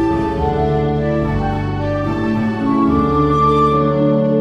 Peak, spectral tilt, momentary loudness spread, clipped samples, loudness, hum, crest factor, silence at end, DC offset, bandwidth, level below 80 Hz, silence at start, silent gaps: -4 dBFS; -9 dB/octave; 6 LU; under 0.1%; -16 LUFS; none; 12 dB; 0 s; 0.7%; 8.2 kHz; -30 dBFS; 0 s; none